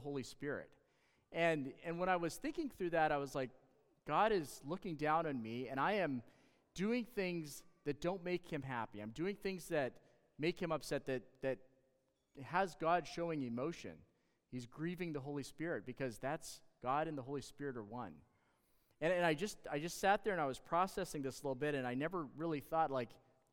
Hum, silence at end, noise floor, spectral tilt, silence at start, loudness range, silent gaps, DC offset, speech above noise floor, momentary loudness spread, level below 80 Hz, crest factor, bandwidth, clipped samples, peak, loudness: none; 0.35 s; -80 dBFS; -5.5 dB/octave; 0 s; 5 LU; none; under 0.1%; 40 dB; 11 LU; -68 dBFS; 20 dB; 17.5 kHz; under 0.1%; -20 dBFS; -41 LUFS